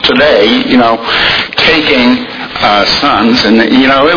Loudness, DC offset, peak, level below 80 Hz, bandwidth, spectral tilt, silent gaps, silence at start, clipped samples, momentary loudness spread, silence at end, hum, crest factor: -7 LUFS; under 0.1%; 0 dBFS; -36 dBFS; 5.4 kHz; -4.5 dB/octave; none; 0 s; 2%; 3 LU; 0 s; none; 8 dB